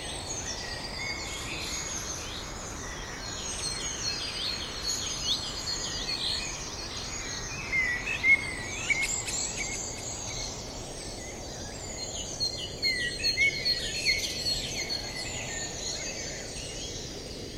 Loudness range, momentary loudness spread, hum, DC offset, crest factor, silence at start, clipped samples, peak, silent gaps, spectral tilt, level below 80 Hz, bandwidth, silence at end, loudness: 6 LU; 11 LU; none; under 0.1%; 20 dB; 0 s; under 0.1%; -12 dBFS; none; -1 dB/octave; -46 dBFS; 16 kHz; 0 s; -30 LUFS